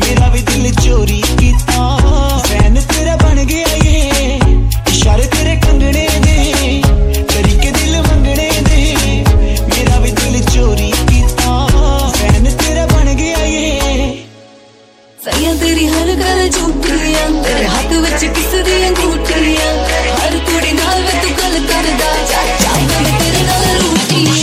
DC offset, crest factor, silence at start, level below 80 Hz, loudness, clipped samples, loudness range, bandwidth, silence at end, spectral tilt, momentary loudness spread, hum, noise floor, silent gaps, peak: under 0.1%; 10 dB; 0 s; -14 dBFS; -11 LUFS; under 0.1%; 3 LU; 16.5 kHz; 0 s; -4.5 dB/octave; 2 LU; none; -42 dBFS; none; 0 dBFS